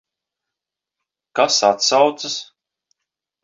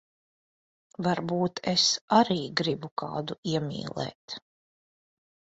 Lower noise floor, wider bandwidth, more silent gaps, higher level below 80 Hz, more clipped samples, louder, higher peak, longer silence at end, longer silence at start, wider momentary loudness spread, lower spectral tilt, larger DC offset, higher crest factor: second, -85 dBFS vs under -90 dBFS; about the same, 7.8 kHz vs 8 kHz; second, none vs 2.01-2.08 s, 2.91-2.97 s, 3.38-3.43 s, 4.15-4.28 s; second, -74 dBFS vs -66 dBFS; neither; first, -17 LUFS vs -28 LUFS; first, -2 dBFS vs -8 dBFS; second, 1 s vs 1.2 s; first, 1.35 s vs 1 s; about the same, 12 LU vs 14 LU; second, -1 dB/octave vs -4 dB/octave; neither; about the same, 20 dB vs 22 dB